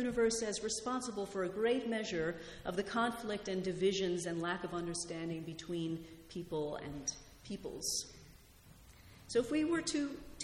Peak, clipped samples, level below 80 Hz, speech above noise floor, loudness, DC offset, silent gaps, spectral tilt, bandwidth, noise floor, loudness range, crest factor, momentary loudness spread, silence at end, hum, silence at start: -22 dBFS; under 0.1%; -62 dBFS; 22 dB; -38 LUFS; under 0.1%; none; -4 dB/octave; 16.5 kHz; -60 dBFS; 5 LU; 16 dB; 11 LU; 0 s; none; 0 s